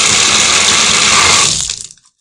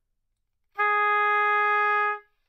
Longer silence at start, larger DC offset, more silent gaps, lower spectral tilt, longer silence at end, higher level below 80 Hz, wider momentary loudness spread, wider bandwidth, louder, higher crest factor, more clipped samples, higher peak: second, 0 s vs 0.75 s; neither; neither; about the same, 0.5 dB/octave vs -0.5 dB/octave; about the same, 0.35 s vs 0.3 s; first, -40 dBFS vs -78 dBFS; first, 10 LU vs 6 LU; first, 12 kHz vs 6.2 kHz; first, -7 LUFS vs -22 LUFS; about the same, 10 dB vs 10 dB; first, 0.4% vs under 0.1%; first, 0 dBFS vs -14 dBFS